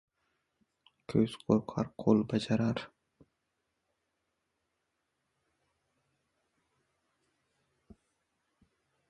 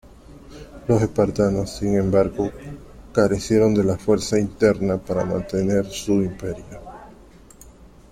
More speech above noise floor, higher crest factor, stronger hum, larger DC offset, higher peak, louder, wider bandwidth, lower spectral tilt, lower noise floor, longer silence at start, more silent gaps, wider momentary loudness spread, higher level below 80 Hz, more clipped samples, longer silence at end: first, 53 dB vs 26 dB; first, 26 dB vs 18 dB; neither; neither; second, -12 dBFS vs -4 dBFS; second, -31 LUFS vs -21 LUFS; second, 11.5 kHz vs 14.5 kHz; about the same, -7.5 dB/octave vs -6.5 dB/octave; first, -83 dBFS vs -46 dBFS; first, 1.1 s vs 0.3 s; neither; second, 9 LU vs 20 LU; second, -66 dBFS vs -44 dBFS; neither; first, 6.25 s vs 0.25 s